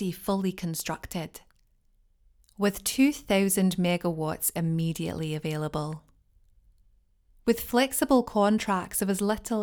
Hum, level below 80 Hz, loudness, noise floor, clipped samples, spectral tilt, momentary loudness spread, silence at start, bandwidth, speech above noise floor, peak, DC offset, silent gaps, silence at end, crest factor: none; -54 dBFS; -27 LUFS; -65 dBFS; under 0.1%; -5 dB/octave; 10 LU; 0 s; over 20 kHz; 38 dB; -10 dBFS; under 0.1%; none; 0 s; 18 dB